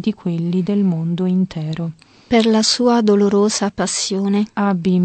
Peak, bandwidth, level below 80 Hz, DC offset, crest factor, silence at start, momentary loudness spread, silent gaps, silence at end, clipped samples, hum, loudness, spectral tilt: -4 dBFS; 9 kHz; -54 dBFS; under 0.1%; 14 dB; 0 s; 8 LU; none; 0 s; under 0.1%; none; -17 LUFS; -5 dB/octave